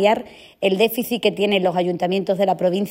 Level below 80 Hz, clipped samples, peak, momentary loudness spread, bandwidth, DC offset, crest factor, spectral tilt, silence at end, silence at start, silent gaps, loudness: -62 dBFS; under 0.1%; -4 dBFS; 4 LU; 16.5 kHz; under 0.1%; 16 dB; -5.5 dB/octave; 0 s; 0 s; none; -20 LUFS